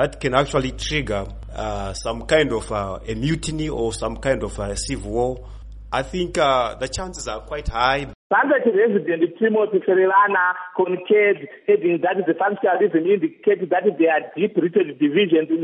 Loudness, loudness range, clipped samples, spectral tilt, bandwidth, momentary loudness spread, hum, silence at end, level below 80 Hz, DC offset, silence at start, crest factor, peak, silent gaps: -20 LUFS; 6 LU; under 0.1%; -5 dB/octave; 11.5 kHz; 10 LU; none; 0 s; -38 dBFS; under 0.1%; 0 s; 16 dB; -4 dBFS; 8.15-8.30 s